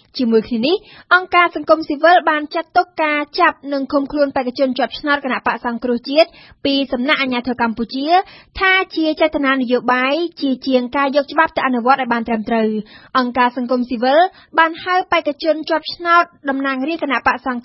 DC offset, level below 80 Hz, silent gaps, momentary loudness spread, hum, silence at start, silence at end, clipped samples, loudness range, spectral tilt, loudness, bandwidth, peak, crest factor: under 0.1%; -50 dBFS; none; 6 LU; none; 0.15 s; 0.05 s; under 0.1%; 3 LU; -7 dB/octave; -16 LUFS; 5.8 kHz; 0 dBFS; 16 dB